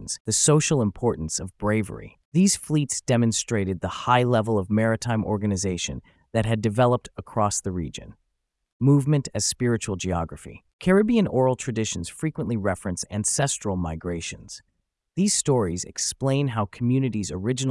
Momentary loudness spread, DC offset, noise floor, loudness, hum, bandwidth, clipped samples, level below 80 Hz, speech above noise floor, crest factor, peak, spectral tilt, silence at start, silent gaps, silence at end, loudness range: 10 LU; under 0.1%; -77 dBFS; -24 LUFS; none; 12 kHz; under 0.1%; -50 dBFS; 54 dB; 18 dB; -6 dBFS; -5 dB/octave; 0 s; 0.20-0.25 s, 2.25-2.32 s, 8.72-8.80 s, 10.73-10.79 s; 0 s; 3 LU